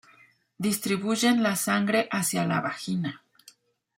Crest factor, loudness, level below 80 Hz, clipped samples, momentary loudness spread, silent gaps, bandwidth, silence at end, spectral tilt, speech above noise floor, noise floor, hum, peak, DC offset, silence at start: 16 dB; -26 LUFS; -70 dBFS; under 0.1%; 8 LU; none; 16.5 kHz; 0.8 s; -4 dB/octave; 33 dB; -59 dBFS; none; -12 dBFS; under 0.1%; 0.6 s